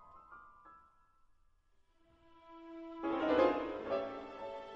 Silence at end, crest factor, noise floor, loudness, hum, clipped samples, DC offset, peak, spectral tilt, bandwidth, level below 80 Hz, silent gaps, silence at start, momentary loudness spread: 0 s; 22 dB; -71 dBFS; -36 LUFS; none; under 0.1%; under 0.1%; -18 dBFS; -6.5 dB/octave; 7.4 kHz; -68 dBFS; none; 0 s; 26 LU